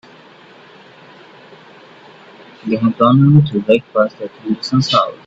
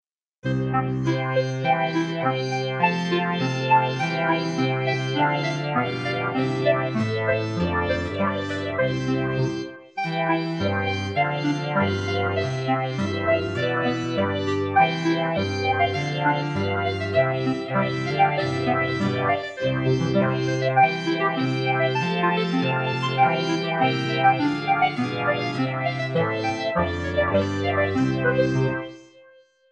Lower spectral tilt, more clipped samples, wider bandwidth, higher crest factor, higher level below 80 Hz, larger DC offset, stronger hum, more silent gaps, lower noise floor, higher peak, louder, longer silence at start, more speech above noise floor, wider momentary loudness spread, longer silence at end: about the same, -7.5 dB/octave vs -6.5 dB/octave; neither; second, 7.8 kHz vs 8.8 kHz; about the same, 16 dB vs 18 dB; about the same, -54 dBFS vs -52 dBFS; neither; neither; neither; second, -42 dBFS vs -54 dBFS; first, 0 dBFS vs -6 dBFS; first, -14 LUFS vs -23 LUFS; first, 2.65 s vs 0.45 s; about the same, 29 dB vs 31 dB; first, 12 LU vs 5 LU; second, 0.1 s vs 0.65 s